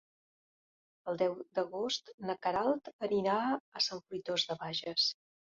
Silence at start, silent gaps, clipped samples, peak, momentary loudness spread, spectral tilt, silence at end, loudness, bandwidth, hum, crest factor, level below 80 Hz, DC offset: 1.05 s; 2.14-2.18 s, 2.93-2.99 s, 3.60-3.72 s; under 0.1%; -18 dBFS; 8 LU; -2 dB/octave; 0.45 s; -34 LUFS; 7.6 kHz; none; 18 dB; -74 dBFS; under 0.1%